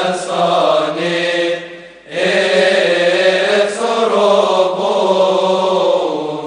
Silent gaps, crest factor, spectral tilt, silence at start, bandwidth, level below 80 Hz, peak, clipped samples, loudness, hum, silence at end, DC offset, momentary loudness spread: none; 14 dB; -4 dB/octave; 0 s; 10 kHz; -62 dBFS; 0 dBFS; under 0.1%; -14 LUFS; none; 0 s; under 0.1%; 6 LU